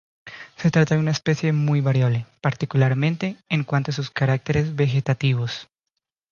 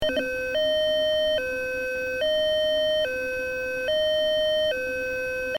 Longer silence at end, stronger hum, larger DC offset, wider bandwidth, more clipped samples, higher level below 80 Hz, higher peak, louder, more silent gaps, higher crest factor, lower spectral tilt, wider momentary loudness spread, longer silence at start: first, 0.7 s vs 0 s; neither; second, under 0.1% vs 0.2%; second, 7.2 kHz vs 17 kHz; neither; about the same, -52 dBFS vs -50 dBFS; first, -6 dBFS vs -14 dBFS; first, -22 LUFS vs -25 LUFS; neither; about the same, 16 dB vs 12 dB; first, -7 dB/octave vs -3 dB/octave; first, 8 LU vs 5 LU; first, 0.25 s vs 0 s